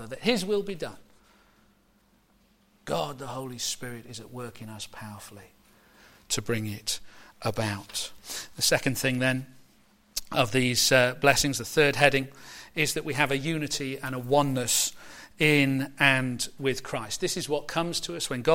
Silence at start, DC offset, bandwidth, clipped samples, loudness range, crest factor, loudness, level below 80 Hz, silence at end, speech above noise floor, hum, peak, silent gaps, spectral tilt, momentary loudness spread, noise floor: 0 s; under 0.1%; 16.5 kHz; under 0.1%; 12 LU; 24 dB; -26 LUFS; -54 dBFS; 0 s; 37 dB; none; -4 dBFS; none; -3.5 dB/octave; 18 LU; -64 dBFS